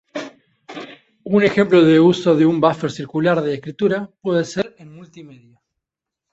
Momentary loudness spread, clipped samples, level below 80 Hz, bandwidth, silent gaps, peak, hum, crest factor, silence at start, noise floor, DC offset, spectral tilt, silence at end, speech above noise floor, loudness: 22 LU; under 0.1%; -60 dBFS; 8 kHz; none; -2 dBFS; none; 16 dB; 0.15 s; -84 dBFS; under 0.1%; -7 dB/octave; 1.05 s; 67 dB; -17 LUFS